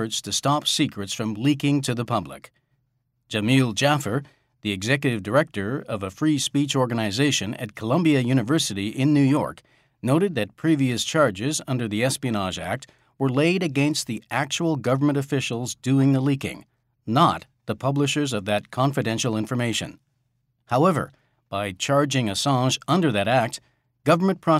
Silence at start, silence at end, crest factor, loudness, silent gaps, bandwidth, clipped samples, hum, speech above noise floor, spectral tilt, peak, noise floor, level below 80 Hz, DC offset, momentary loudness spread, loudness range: 0 s; 0 s; 18 dB; -23 LUFS; none; 15.5 kHz; under 0.1%; none; 49 dB; -5 dB/octave; -6 dBFS; -72 dBFS; -62 dBFS; under 0.1%; 9 LU; 3 LU